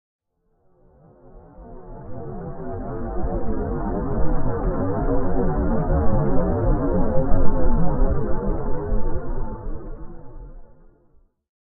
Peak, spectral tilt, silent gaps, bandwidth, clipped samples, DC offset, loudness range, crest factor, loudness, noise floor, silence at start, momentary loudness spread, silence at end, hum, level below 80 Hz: -2 dBFS; -13.5 dB/octave; none; 2 kHz; under 0.1%; under 0.1%; 10 LU; 16 dB; -25 LUFS; -64 dBFS; 0.2 s; 19 LU; 0.2 s; none; -24 dBFS